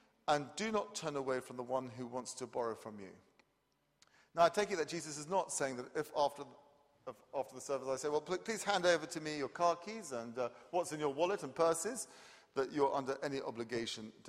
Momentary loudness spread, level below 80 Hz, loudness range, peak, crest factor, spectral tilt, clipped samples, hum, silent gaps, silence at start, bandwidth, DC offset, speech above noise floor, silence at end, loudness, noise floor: 11 LU; -78 dBFS; 3 LU; -18 dBFS; 22 dB; -3.5 dB/octave; under 0.1%; none; none; 0.25 s; 15 kHz; under 0.1%; 41 dB; 0 s; -38 LUFS; -79 dBFS